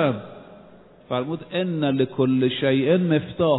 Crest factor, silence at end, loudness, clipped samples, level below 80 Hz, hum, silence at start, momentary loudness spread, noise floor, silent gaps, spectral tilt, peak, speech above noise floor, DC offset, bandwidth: 16 dB; 0 s; -22 LUFS; under 0.1%; -58 dBFS; none; 0 s; 9 LU; -49 dBFS; none; -11.5 dB/octave; -8 dBFS; 27 dB; under 0.1%; 4.1 kHz